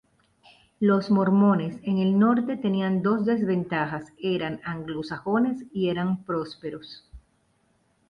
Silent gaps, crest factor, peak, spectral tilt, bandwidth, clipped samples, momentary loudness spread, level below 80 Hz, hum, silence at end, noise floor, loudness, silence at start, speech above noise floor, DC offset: none; 16 dB; -10 dBFS; -8.5 dB/octave; 5.4 kHz; under 0.1%; 12 LU; -60 dBFS; none; 0.9 s; -67 dBFS; -25 LUFS; 0.8 s; 43 dB; under 0.1%